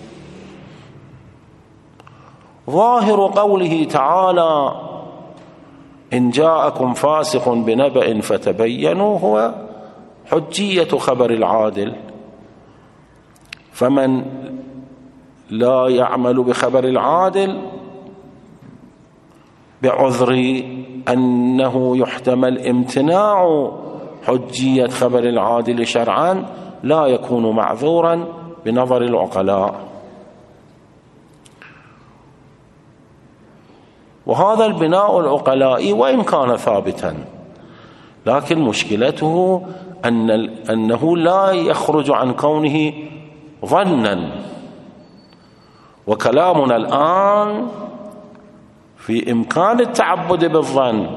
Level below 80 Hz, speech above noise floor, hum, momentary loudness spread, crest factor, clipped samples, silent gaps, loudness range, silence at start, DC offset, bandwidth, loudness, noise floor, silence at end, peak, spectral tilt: -58 dBFS; 32 dB; none; 17 LU; 18 dB; under 0.1%; none; 5 LU; 0 s; under 0.1%; 12 kHz; -16 LUFS; -48 dBFS; 0 s; 0 dBFS; -6 dB/octave